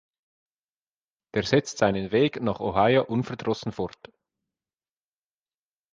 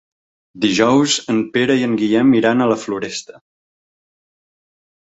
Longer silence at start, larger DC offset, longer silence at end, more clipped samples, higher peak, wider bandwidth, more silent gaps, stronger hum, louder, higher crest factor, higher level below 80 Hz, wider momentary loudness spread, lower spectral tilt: first, 1.35 s vs 0.55 s; neither; first, 2.05 s vs 1.8 s; neither; second, -6 dBFS vs -2 dBFS; first, 9.6 kHz vs 8 kHz; neither; neither; second, -25 LUFS vs -16 LUFS; first, 22 dB vs 16 dB; about the same, -56 dBFS vs -58 dBFS; about the same, 10 LU vs 10 LU; about the same, -5.5 dB/octave vs -4.5 dB/octave